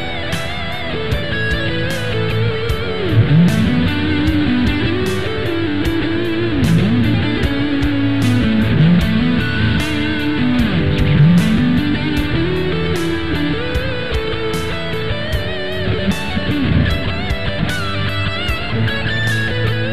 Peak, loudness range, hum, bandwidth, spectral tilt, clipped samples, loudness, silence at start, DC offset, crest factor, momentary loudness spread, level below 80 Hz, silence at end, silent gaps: -2 dBFS; 4 LU; none; 14 kHz; -6.5 dB/octave; under 0.1%; -17 LUFS; 0 s; 5%; 14 dB; 7 LU; -28 dBFS; 0 s; none